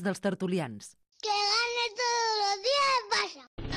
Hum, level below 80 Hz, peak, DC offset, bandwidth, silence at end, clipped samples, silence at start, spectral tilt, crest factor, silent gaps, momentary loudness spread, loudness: none; -54 dBFS; -14 dBFS; under 0.1%; 14 kHz; 0 s; under 0.1%; 0 s; -3 dB/octave; 16 dB; 3.47-3.57 s; 12 LU; -28 LUFS